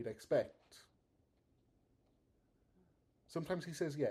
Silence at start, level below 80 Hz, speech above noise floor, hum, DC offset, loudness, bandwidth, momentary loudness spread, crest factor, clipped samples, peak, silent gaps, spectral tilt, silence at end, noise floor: 0 s; -76 dBFS; 37 dB; none; under 0.1%; -41 LUFS; 14.5 kHz; 10 LU; 22 dB; under 0.1%; -22 dBFS; none; -6 dB/octave; 0 s; -77 dBFS